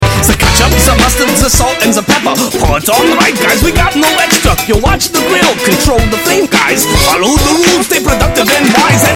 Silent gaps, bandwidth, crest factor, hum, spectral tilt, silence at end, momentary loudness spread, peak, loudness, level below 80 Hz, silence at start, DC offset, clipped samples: none; 19.5 kHz; 8 dB; none; -3.5 dB/octave; 0 s; 3 LU; 0 dBFS; -8 LUFS; -18 dBFS; 0 s; under 0.1%; 0.2%